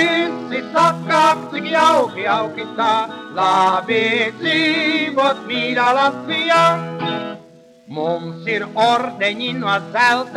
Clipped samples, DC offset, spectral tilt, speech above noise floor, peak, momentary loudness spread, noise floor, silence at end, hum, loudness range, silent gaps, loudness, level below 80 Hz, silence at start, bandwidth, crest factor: under 0.1%; under 0.1%; -4 dB/octave; 27 dB; -2 dBFS; 9 LU; -44 dBFS; 0 s; none; 3 LU; none; -17 LUFS; -68 dBFS; 0 s; 14 kHz; 16 dB